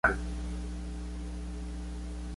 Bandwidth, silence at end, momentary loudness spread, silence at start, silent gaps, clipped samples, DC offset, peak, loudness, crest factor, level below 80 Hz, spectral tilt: 11.5 kHz; 0 s; 4 LU; 0.05 s; none; under 0.1%; under 0.1%; -10 dBFS; -38 LUFS; 24 dB; -38 dBFS; -6 dB/octave